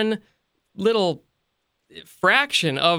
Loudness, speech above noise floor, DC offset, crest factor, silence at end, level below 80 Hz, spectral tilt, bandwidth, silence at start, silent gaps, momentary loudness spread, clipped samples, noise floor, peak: -21 LUFS; 53 dB; under 0.1%; 20 dB; 0 s; -68 dBFS; -4 dB/octave; 16.5 kHz; 0 s; none; 11 LU; under 0.1%; -74 dBFS; -2 dBFS